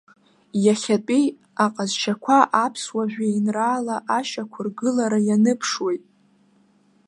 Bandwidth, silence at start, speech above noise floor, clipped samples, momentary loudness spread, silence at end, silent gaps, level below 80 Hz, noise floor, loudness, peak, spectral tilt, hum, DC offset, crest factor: 11 kHz; 0.55 s; 38 dB; under 0.1%; 8 LU; 1.1 s; none; -74 dBFS; -59 dBFS; -22 LUFS; -2 dBFS; -4.5 dB/octave; none; under 0.1%; 20 dB